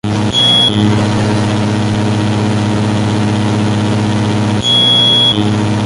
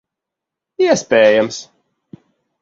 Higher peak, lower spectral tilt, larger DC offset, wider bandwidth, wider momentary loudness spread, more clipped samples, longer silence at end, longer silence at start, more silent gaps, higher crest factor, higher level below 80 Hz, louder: about the same, 0 dBFS vs 0 dBFS; first, -5 dB/octave vs -3.5 dB/octave; neither; first, 11.5 kHz vs 7.8 kHz; second, 7 LU vs 11 LU; neither; second, 0 s vs 1 s; second, 0.05 s vs 0.8 s; neither; second, 10 dB vs 18 dB; first, -36 dBFS vs -60 dBFS; first, -11 LUFS vs -14 LUFS